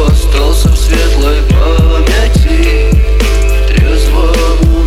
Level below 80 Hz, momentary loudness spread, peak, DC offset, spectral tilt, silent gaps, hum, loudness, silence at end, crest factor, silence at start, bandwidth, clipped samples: -8 dBFS; 1 LU; 0 dBFS; under 0.1%; -5.5 dB/octave; none; none; -10 LUFS; 0 s; 6 dB; 0 s; 14.5 kHz; under 0.1%